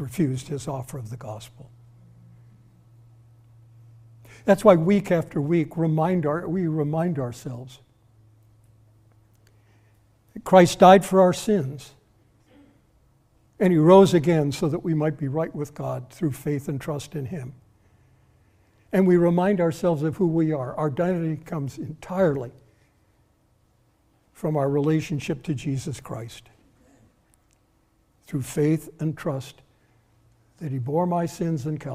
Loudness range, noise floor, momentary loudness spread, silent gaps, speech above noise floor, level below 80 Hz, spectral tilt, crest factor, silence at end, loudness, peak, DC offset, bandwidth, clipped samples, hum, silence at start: 12 LU; -64 dBFS; 19 LU; none; 42 dB; -56 dBFS; -7 dB/octave; 22 dB; 0 s; -23 LUFS; -2 dBFS; under 0.1%; 15.5 kHz; under 0.1%; none; 0 s